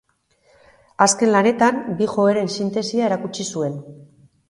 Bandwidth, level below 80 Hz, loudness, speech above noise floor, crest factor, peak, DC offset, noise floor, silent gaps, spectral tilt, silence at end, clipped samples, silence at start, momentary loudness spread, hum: 11.5 kHz; -64 dBFS; -19 LUFS; 42 dB; 20 dB; 0 dBFS; under 0.1%; -61 dBFS; none; -4 dB/octave; 0.45 s; under 0.1%; 1 s; 10 LU; none